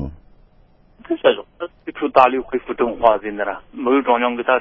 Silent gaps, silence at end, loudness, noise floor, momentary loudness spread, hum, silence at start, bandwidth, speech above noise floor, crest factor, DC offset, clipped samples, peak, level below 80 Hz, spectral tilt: none; 0 s; -18 LUFS; -52 dBFS; 14 LU; none; 0 s; 6 kHz; 35 dB; 20 dB; under 0.1%; under 0.1%; 0 dBFS; -46 dBFS; -7.5 dB/octave